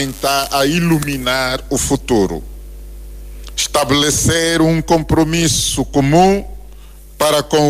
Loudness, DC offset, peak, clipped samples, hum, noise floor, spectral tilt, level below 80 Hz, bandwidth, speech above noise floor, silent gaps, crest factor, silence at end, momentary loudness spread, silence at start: -14 LUFS; under 0.1%; -4 dBFS; under 0.1%; none; -36 dBFS; -4 dB/octave; -32 dBFS; 16 kHz; 22 dB; none; 12 dB; 0 s; 22 LU; 0 s